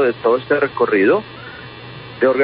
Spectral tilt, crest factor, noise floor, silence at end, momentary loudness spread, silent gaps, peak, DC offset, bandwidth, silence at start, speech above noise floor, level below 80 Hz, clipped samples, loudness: -11 dB/octave; 14 dB; -34 dBFS; 0 s; 19 LU; none; -4 dBFS; under 0.1%; 5.2 kHz; 0 s; 19 dB; -54 dBFS; under 0.1%; -16 LUFS